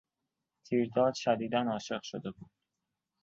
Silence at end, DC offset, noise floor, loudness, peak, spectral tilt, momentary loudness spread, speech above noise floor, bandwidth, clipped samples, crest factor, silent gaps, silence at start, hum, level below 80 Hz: 0.8 s; under 0.1%; -87 dBFS; -32 LUFS; -14 dBFS; -5.5 dB/octave; 12 LU; 55 dB; 7.8 kHz; under 0.1%; 20 dB; none; 0.7 s; none; -72 dBFS